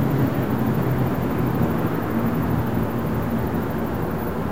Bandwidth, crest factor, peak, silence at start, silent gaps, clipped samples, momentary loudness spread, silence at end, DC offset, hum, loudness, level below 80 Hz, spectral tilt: 16 kHz; 14 dB; -8 dBFS; 0 s; none; under 0.1%; 4 LU; 0 s; 2%; none; -23 LUFS; -38 dBFS; -8.5 dB/octave